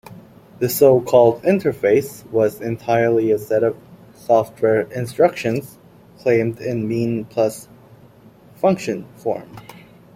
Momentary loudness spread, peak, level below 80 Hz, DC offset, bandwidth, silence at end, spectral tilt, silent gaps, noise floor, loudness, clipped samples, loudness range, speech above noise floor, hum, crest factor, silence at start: 12 LU; -2 dBFS; -56 dBFS; under 0.1%; 16.5 kHz; 0.35 s; -6.5 dB/octave; none; -47 dBFS; -19 LUFS; under 0.1%; 7 LU; 29 dB; none; 18 dB; 0.1 s